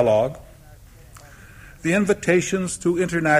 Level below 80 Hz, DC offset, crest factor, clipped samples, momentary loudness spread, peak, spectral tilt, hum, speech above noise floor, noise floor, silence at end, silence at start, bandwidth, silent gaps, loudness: -48 dBFS; under 0.1%; 16 dB; under 0.1%; 8 LU; -6 dBFS; -5.5 dB/octave; none; 26 dB; -46 dBFS; 0 s; 0 s; 15.5 kHz; none; -21 LUFS